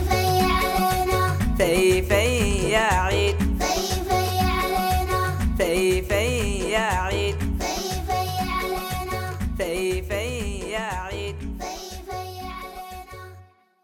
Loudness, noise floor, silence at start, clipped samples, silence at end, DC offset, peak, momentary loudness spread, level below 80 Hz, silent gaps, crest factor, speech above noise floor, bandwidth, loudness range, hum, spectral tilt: -23 LUFS; -49 dBFS; 0 s; under 0.1%; 0.4 s; under 0.1%; -6 dBFS; 13 LU; -32 dBFS; none; 16 dB; 30 dB; 18.5 kHz; 9 LU; none; -4.5 dB/octave